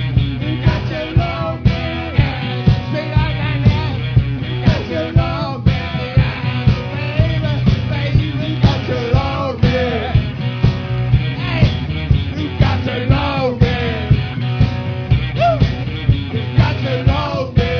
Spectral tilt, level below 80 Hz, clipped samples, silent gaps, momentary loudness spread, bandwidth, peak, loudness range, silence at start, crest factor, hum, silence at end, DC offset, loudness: -8 dB/octave; -24 dBFS; under 0.1%; none; 4 LU; 5.4 kHz; 0 dBFS; 1 LU; 0 s; 16 dB; none; 0 s; under 0.1%; -17 LUFS